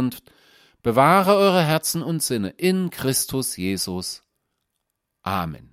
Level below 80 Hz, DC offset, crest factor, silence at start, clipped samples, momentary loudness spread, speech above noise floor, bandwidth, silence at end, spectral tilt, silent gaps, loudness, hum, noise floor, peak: -56 dBFS; under 0.1%; 20 dB; 0 s; under 0.1%; 13 LU; 57 dB; 16 kHz; 0.15 s; -4.5 dB/octave; none; -21 LUFS; none; -78 dBFS; -2 dBFS